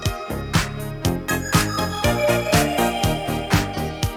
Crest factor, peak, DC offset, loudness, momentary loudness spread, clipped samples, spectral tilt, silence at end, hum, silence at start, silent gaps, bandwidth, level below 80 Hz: 18 dB; -4 dBFS; under 0.1%; -21 LUFS; 7 LU; under 0.1%; -4.5 dB/octave; 0 s; none; 0 s; none; over 20 kHz; -34 dBFS